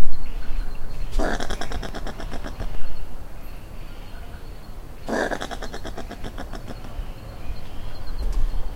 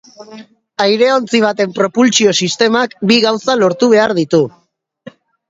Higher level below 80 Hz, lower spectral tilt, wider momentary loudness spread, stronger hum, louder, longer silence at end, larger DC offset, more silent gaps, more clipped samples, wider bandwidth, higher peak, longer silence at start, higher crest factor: first, -28 dBFS vs -58 dBFS; about the same, -5 dB/octave vs -4 dB/octave; first, 14 LU vs 5 LU; neither; second, -33 LUFS vs -12 LUFS; second, 0 s vs 0.4 s; neither; neither; neither; first, 8.6 kHz vs 7.8 kHz; about the same, 0 dBFS vs 0 dBFS; second, 0 s vs 0.2 s; about the same, 18 dB vs 14 dB